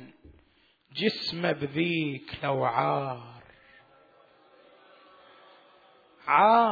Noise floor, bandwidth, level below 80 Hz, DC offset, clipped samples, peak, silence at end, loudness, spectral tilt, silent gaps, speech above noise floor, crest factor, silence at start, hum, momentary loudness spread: -65 dBFS; 5 kHz; -68 dBFS; under 0.1%; under 0.1%; -8 dBFS; 0 s; -27 LUFS; -7 dB/octave; none; 40 dB; 22 dB; 0 s; none; 18 LU